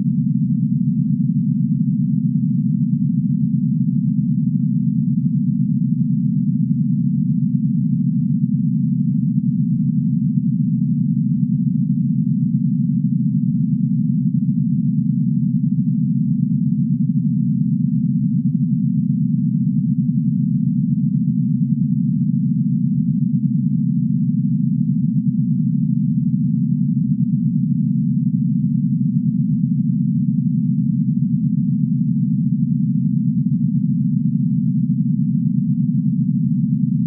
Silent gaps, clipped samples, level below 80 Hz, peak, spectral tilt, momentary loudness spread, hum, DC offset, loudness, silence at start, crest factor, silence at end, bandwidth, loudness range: none; under 0.1%; -56 dBFS; -6 dBFS; -17 dB/octave; 0 LU; none; under 0.1%; -18 LUFS; 0 s; 12 dB; 0 s; 0.4 kHz; 0 LU